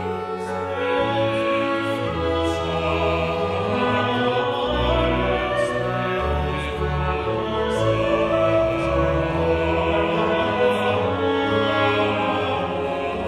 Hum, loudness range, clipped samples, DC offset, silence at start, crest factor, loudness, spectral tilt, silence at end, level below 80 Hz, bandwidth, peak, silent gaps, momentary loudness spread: none; 2 LU; under 0.1%; under 0.1%; 0 s; 14 dB; -22 LUFS; -6.5 dB/octave; 0 s; -34 dBFS; 13 kHz; -6 dBFS; none; 5 LU